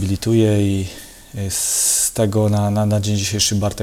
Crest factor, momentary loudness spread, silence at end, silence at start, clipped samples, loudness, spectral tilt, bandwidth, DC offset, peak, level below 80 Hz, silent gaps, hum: 16 dB; 12 LU; 0 s; 0 s; under 0.1%; -17 LUFS; -4.5 dB/octave; 16.5 kHz; under 0.1%; -2 dBFS; -44 dBFS; none; none